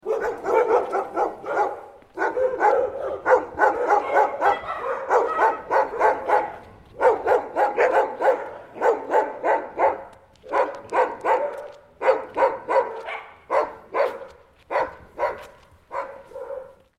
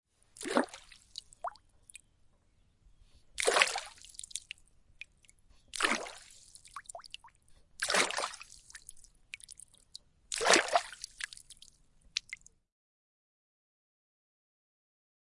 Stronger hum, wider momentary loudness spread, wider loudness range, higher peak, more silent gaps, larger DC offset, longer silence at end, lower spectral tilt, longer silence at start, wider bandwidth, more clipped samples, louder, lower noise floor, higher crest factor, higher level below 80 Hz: neither; second, 15 LU vs 26 LU; second, 5 LU vs 12 LU; about the same, -4 dBFS vs -4 dBFS; neither; neither; second, 0.25 s vs 3 s; first, -4.5 dB/octave vs -0.5 dB/octave; second, 0.05 s vs 0.4 s; about the same, 11 kHz vs 11.5 kHz; neither; first, -23 LUFS vs -32 LUFS; second, -48 dBFS vs -69 dBFS; second, 20 dB vs 34 dB; first, -58 dBFS vs -68 dBFS